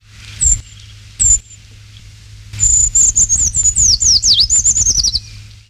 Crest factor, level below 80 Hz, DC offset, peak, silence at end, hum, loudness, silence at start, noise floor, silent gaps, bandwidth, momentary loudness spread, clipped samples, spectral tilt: 14 dB; -28 dBFS; under 0.1%; -2 dBFS; 0.25 s; none; -10 LUFS; 0.2 s; -38 dBFS; none; 15.5 kHz; 7 LU; under 0.1%; 0.5 dB/octave